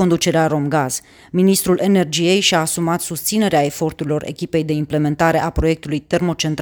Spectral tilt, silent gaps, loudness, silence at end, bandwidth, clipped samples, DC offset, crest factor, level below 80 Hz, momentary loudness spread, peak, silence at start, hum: -4.5 dB/octave; none; -17 LUFS; 0 s; over 20 kHz; under 0.1%; under 0.1%; 16 dB; -38 dBFS; 8 LU; 0 dBFS; 0 s; none